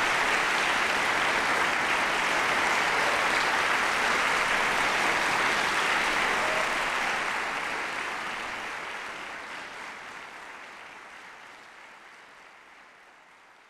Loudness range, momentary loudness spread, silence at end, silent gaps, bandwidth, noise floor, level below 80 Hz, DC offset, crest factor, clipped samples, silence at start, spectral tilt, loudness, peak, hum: 18 LU; 18 LU; 0.85 s; none; 16 kHz; -55 dBFS; -56 dBFS; under 0.1%; 16 dB; under 0.1%; 0 s; -1.5 dB/octave; -25 LUFS; -12 dBFS; none